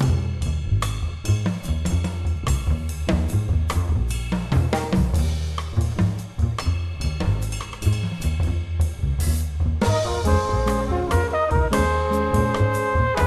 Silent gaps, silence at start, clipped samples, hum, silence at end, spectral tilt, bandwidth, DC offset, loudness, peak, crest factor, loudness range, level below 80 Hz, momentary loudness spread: none; 0 s; under 0.1%; none; 0 s; -6.5 dB/octave; 13 kHz; under 0.1%; -23 LUFS; -6 dBFS; 14 dB; 3 LU; -26 dBFS; 5 LU